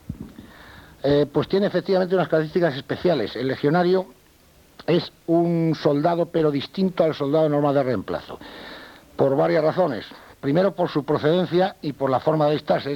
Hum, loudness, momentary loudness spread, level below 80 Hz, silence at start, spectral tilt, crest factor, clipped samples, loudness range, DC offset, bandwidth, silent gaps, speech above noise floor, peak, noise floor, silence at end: none; -22 LUFS; 15 LU; -54 dBFS; 0.1 s; -8 dB/octave; 16 dB; under 0.1%; 2 LU; under 0.1%; 18 kHz; none; 33 dB; -6 dBFS; -54 dBFS; 0 s